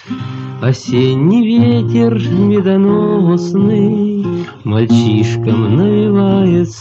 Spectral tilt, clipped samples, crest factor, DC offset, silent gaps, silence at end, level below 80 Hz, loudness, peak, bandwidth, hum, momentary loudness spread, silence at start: -8 dB/octave; under 0.1%; 10 dB; under 0.1%; none; 0 s; -50 dBFS; -12 LUFS; 0 dBFS; 7.8 kHz; none; 7 LU; 0.05 s